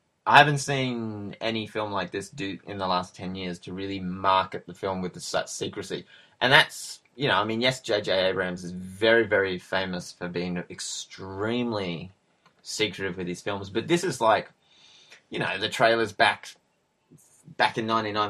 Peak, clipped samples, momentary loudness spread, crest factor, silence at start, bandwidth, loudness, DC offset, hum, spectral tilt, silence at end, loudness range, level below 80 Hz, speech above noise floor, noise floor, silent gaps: 0 dBFS; under 0.1%; 15 LU; 26 dB; 0.25 s; 15 kHz; -26 LUFS; under 0.1%; none; -4 dB/octave; 0 s; 7 LU; -66 dBFS; 44 dB; -70 dBFS; none